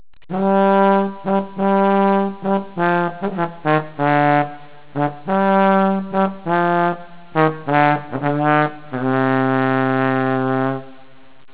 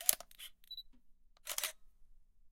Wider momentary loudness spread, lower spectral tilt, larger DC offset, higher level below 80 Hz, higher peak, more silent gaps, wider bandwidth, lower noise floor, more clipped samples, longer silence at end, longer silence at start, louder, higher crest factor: second, 8 LU vs 15 LU; first, -11 dB/octave vs 2.5 dB/octave; first, 1% vs under 0.1%; first, -60 dBFS vs -66 dBFS; first, 0 dBFS vs -4 dBFS; neither; second, 4 kHz vs 17 kHz; second, -48 dBFS vs -62 dBFS; neither; first, 0.6 s vs 0.05 s; first, 0.3 s vs 0 s; first, -18 LUFS vs -41 LUFS; second, 18 dB vs 38 dB